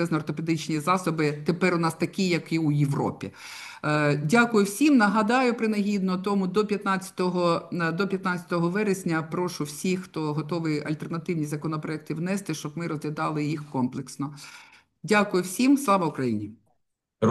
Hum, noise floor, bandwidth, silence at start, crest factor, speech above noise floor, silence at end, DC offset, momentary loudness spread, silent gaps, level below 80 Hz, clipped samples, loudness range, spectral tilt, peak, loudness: none; -75 dBFS; 12.5 kHz; 0 s; 18 dB; 50 dB; 0 s; under 0.1%; 11 LU; none; -70 dBFS; under 0.1%; 7 LU; -6 dB/octave; -6 dBFS; -26 LUFS